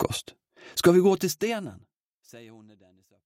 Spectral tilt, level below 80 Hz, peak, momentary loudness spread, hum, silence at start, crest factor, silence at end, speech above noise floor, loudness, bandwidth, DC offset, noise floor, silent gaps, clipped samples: -5 dB/octave; -60 dBFS; -6 dBFS; 15 LU; none; 0 s; 22 dB; 0.8 s; 25 dB; -24 LUFS; 16.5 kHz; under 0.1%; -50 dBFS; 2.00-2.20 s; under 0.1%